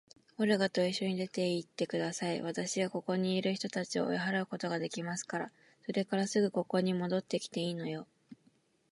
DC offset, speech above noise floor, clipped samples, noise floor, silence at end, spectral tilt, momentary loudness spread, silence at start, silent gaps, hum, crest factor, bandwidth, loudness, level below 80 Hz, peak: under 0.1%; 37 dB; under 0.1%; -70 dBFS; 0.55 s; -5 dB/octave; 8 LU; 0.4 s; none; none; 18 dB; 11.5 kHz; -34 LUFS; -82 dBFS; -16 dBFS